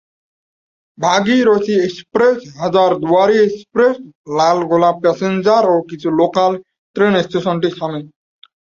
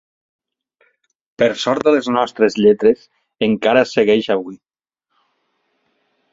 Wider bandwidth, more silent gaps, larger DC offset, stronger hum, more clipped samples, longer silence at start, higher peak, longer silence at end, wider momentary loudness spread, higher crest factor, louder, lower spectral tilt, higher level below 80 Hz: about the same, 7.6 kHz vs 7.8 kHz; first, 4.15-4.24 s, 6.78-6.94 s vs none; neither; neither; neither; second, 1 s vs 1.4 s; about the same, 0 dBFS vs -2 dBFS; second, 0.6 s vs 1.75 s; about the same, 8 LU vs 8 LU; about the same, 14 dB vs 16 dB; about the same, -15 LUFS vs -16 LUFS; about the same, -5.5 dB/octave vs -5.5 dB/octave; about the same, -58 dBFS vs -58 dBFS